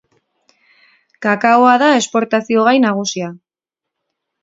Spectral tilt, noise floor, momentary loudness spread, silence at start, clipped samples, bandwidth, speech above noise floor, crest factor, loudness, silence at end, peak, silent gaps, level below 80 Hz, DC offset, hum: -4 dB/octave; -83 dBFS; 12 LU; 1.2 s; under 0.1%; 7.8 kHz; 70 dB; 16 dB; -13 LUFS; 1.05 s; 0 dBFS; none; -68 dBFS; under 0.1%; none